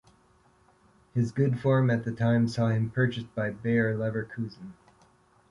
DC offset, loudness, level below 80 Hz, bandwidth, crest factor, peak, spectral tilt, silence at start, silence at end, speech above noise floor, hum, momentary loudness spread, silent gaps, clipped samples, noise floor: under 0.1%; -28 LUFS; -60 dBFS; 11 kHz; 16 dB; -12 dBFS; -8 dB/octave; 1.15 s; 0.8 s; 36 dB; none; 12 LU; none; under 0.1%; -63 dBFS